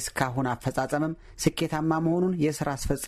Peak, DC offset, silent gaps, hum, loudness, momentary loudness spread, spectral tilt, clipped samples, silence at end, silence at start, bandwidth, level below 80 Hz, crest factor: -8 dBFS; under 0.1%; none; none; -27 LUFS; 4 LU; -5.5 dB/octave; under 0.1%; 0 s; 0 s; 14.5 kHz; -44 dBFS; 18 dB